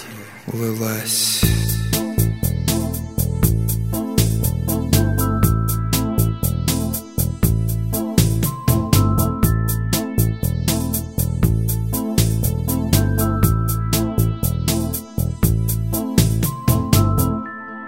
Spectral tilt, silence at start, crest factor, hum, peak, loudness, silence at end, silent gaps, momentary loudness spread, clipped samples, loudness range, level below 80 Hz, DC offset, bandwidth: -5.5 dB/octave; 0 s; 18 dB; none; 0 dBFS; -19 LUFS; 0 s; none; 6 LU; under 0.1%; 1 LU; -28 dBFS; 0.2%; 16.5 kHz